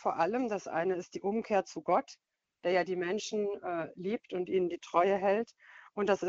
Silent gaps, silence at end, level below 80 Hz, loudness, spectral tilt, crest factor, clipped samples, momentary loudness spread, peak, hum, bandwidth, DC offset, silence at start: none; 0 s; -74 dBFS; -33 LUFS; -4 dB/octave; 20 dB; under 0.1%; 8 LU; -12 dBFS; none; 7.8 kHz; under 0.1%; 0 s